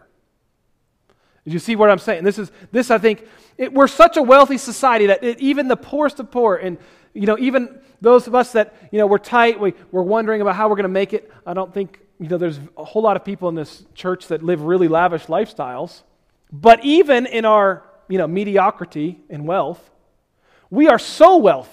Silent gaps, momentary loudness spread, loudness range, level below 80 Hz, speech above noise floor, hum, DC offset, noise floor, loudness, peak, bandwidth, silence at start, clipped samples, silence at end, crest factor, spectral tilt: none; 16 LU; 7 LU; -52 dBFS; 49 dB; none; under 0.1%; -65 dBFS; -16 LUFS; 0 dBFS; 15 kHz; 1.45 s; 0.2%; 0.1 s; 16 dB; -5.5 dB/octave